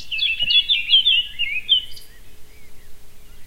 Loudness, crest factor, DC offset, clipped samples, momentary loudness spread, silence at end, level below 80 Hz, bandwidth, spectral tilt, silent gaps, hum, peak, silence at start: -16 LUFS; 18 dB; under 0.1%; under 0.1%; 10 LU; 0 s; -44 dBFS; 16 kHz; 0.5 dB/octave; none; none; -4 dBFS; 0 s